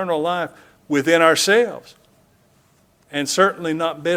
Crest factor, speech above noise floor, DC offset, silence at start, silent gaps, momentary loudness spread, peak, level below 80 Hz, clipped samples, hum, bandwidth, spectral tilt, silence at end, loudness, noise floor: 20 dB; 39 dB; under 0.1%; 0 s; none; 13 LU; 0 dBFS; -66 dBFS; under 0.1%; none; 16.5 kHz; -3 dB/octave; 0 s; -18 LUFS; -58 dBFS